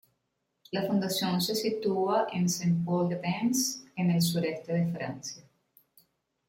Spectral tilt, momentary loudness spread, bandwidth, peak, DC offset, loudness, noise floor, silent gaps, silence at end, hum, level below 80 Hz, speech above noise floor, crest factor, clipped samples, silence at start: -5 dB/octave; 9 LU; 16.5 kHz; -16 dBFS; under 0.1%; -29 LUFS; -80 dBFS; none; 1.1 s; none; -70 dBFS; 51 dB; 14 dB; under 0.1%; 0.7 s